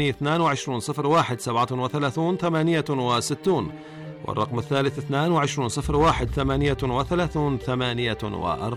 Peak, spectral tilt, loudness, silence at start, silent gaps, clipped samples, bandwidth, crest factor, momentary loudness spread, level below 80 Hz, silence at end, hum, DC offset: -12 dBFS; -5.5 dB/octave; -24 LUFS; 0 s; none; under 0.1%; 14.5 kHz; 12 dB; 6 LU; -40 dBFS; 0 s; none; under 0.1%